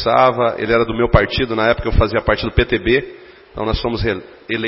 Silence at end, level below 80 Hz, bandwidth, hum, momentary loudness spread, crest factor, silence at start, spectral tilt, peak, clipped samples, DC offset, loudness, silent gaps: 0 s; -26 dBFS; 5.8 kHz; none; 10 LU; 16 dB; 0 s; -10 dB/octave; 0 dBFS; under 0.1%; under 0.1%; -17 LUFS; none